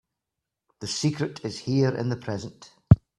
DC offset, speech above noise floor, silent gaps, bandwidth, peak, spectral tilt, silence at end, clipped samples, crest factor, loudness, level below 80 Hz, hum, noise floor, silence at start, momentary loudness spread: under 0.1%; 58 dB; none; 11 kHz; 0 dBFS; -6.5 dB/octave; 0.2 s; under 0.1%; 26 dB; -26 LUFS; -44 dBFS; none; -86 dBFS; 0.8 s; 14 LU